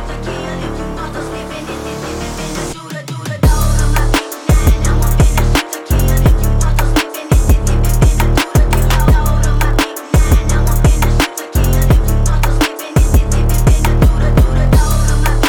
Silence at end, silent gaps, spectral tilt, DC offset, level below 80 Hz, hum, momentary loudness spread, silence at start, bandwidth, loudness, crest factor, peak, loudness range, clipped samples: 0 s; none; -5.5 dB/octave; under 0.1%; -14 dBFS; none; 10 LU; 0 s; over 20 kHz; -14 LUFS; 10 dB; -2 dBFS; 5 LU; under 0.1%